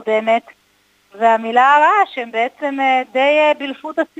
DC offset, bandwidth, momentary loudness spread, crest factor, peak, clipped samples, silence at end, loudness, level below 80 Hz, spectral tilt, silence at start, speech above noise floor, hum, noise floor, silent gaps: under 0.1%; 9.4 kHz; 9 LU; 16 dB; 0 dBFS; under 0.1%; 0.15 s; -15 LUFS; -72 dBFS; -3.5 dB/octave; 0 s; 42 dB; 50 Hz at -70 dBFS; -58 dBFS; none